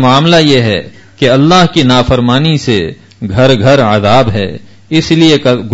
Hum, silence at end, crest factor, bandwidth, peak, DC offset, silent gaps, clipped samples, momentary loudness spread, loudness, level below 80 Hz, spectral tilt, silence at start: none; 0 s; 8 dB; 9.4 kHz; 0 dBFS; under 0.1%; none; 0.6%; 10 LU; -8 LUFS; -32 dBFS; -6 dB/octave; 0 s